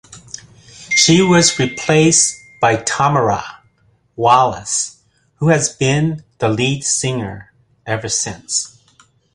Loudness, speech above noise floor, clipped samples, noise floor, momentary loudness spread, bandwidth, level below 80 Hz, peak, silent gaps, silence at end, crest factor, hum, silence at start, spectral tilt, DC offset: -15 LUFS; 42 dB; under 0.1%; -57 dBFS; 19 LU; 11.5 kHz; -48 dBFS; 0 dBFS; none; 0.65 s; 16 dB; none; 0.1 s; -3.5 dB/octave; under 0.1%